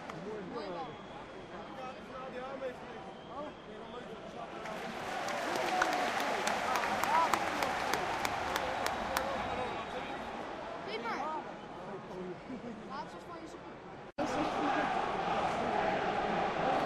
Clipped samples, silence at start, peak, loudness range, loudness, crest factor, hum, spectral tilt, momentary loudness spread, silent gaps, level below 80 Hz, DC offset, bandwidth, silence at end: under 0.1%; 0 s; -12 dBFS; 11 LU; -36 LUFS; 26 dB; none; -3.5 dB/octave; 14 LU; none; -62 dBFS; under 0.1%; 15.5 kHz; 0 s